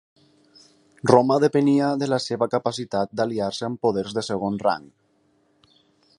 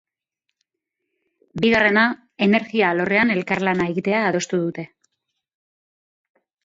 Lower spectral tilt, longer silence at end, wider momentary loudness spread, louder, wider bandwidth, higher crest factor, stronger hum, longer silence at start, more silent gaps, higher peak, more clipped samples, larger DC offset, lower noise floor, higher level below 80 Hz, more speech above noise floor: about the same, -6 dB/octave vs -5.5 dB/octave; second, 1.35 s vs 1.8 s; about the same, 9 LU vs 10 LU; second, -22 LUFS vs -19 LUFS; first, 11.5 kHz vs 7.8 kHz; first, 24 dB vs 18 dB; neither; second, 1.05 s vs 1.55 s; neither; first, 0 dBFS vs -4 dBFS; neither; neither; second, -64 dBFS vs -81 dBFS; about the same, -62 dBFS vs -60 dBFS; second, 43 dB vs 61 dB